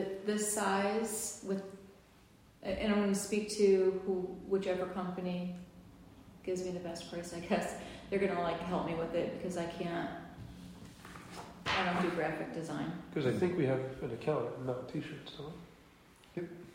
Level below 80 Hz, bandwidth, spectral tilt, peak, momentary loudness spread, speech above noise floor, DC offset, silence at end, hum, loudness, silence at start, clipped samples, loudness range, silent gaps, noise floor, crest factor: -62 dBFS; 16 kHz; -5 dB/octave; -18 dBFS; 17 LU; 27 dB; under 0.1%; 0 s; none; -36 LUFS; 0 s; under 0.1%; 6 LU; none; -62 dBFS; 18 dB